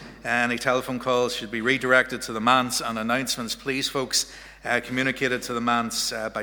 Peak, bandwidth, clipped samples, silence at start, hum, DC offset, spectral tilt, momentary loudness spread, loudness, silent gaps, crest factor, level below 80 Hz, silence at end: -4 dBFS; over 20 kHz; under 0.1%; 0 s; none; under 0.1%; -2.5 dB/octave; 6 LU; -24 LUFS; none; 22 dB; -54 dBFS; 0 s